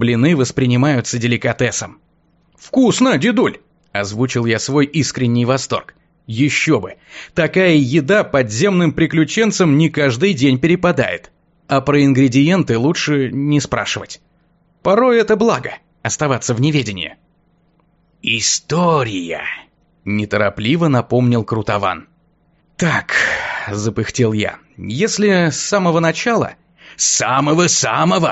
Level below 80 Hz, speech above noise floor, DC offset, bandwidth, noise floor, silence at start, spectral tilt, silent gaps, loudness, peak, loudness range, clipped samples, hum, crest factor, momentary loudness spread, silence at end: -48 dBFS; 42 dB; under 0.1%; 8.2 kHz; -57 dBFS; 0 s; -5 dB/octave; none; -15 LUFS; -2 dBFS; 4 LU; under 0.1%; none; 14 dB; 11 LU; 0 s